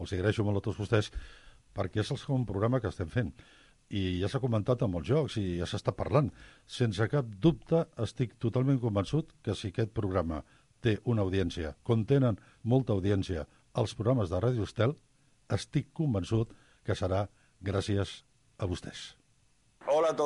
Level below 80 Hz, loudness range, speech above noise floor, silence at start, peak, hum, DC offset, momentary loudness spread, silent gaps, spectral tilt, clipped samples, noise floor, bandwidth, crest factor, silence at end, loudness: -48 dBFS; 4 LU; 38 dB; 0 s; -14 dBFS; none; under 0.1%; 11 LU; none; -7 dB/octave; under 0.1%; -68 dBFS; 11.5 kHz; 18 dB; 0 s; -32 LUFS